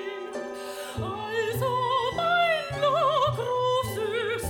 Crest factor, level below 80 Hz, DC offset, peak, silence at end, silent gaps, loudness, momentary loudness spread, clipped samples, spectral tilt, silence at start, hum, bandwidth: 14 dB; -54 dBFS; under 0.1%; -12 dBFS; 0 s; none; -26 LUFS; 12 LU; under 0.1%; -4.5 dB/octave; 0 s; none; 19.5 kHz